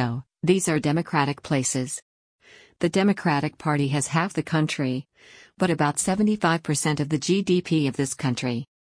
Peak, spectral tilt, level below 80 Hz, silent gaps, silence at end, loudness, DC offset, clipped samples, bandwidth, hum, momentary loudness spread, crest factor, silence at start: -6 dBFS; -5 dB/octave; -60 dBFS; 2.02-2.39 s; 0.3 s; -24 LUFS; under 0.1%; under 0.1%; 10.5 kHz; none; 7 LU; 18 dB; 0 s